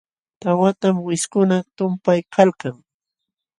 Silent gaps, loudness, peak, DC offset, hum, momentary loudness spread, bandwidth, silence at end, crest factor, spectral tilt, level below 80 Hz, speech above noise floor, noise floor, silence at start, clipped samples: none; -19 LUFS; 0 dBFS; under 0.1%; none; 9 LU; 11.5 kHz; 0.85 s; 20 dB; -6 dB/octave; -66 dBFS; 65 dB; -83 dBFS; 0.45 s; under 0.1%